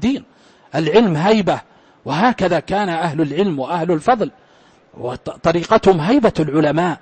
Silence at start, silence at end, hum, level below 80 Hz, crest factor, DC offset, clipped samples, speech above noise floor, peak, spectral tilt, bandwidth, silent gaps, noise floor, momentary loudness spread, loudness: 0 s; 0.05 s; none; -46 dBFS; 16 dB; under 0.1%; under 0.1%; 34 dB; 0 dBFS; -6.5 dB/octave; 8.8 kHz; none; -50 dBFS; 12 LU; -17 LUFS